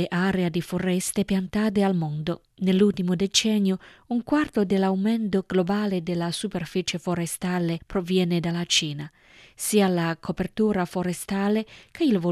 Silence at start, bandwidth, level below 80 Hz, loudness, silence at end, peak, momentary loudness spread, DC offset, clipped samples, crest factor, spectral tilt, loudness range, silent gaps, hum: 0 s; 13.5 kHz; -54 dBFS; -25 LUFS; 0 s; -6 dBFS; 8 LU; under 0.1%; under 0.1%; 18 dB; -5 dB/octave; 3 LU; none; none